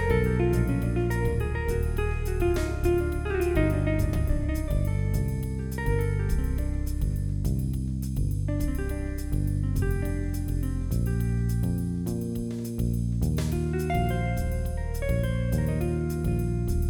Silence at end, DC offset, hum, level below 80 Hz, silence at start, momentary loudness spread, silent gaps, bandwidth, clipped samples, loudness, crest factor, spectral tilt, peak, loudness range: 0 s; under 0.1%; none; -30 dBFS; 0 s; 5 LU; none; 18.5 kHz; under 0.1%; -28 LUFS; 16 dB; -7.5 dB/octave; -10 dBFS; 2 LU